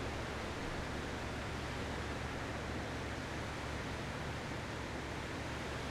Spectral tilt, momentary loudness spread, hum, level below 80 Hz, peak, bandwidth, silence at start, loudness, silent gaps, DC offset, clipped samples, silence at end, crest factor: -5 dB/octave; 1 LU; none; -50 dBFS; -28 dBFS; 15 kHz; 0 s; -42 LUFS; none; under 0.1%; under 0.1%; 0 s; 12 dB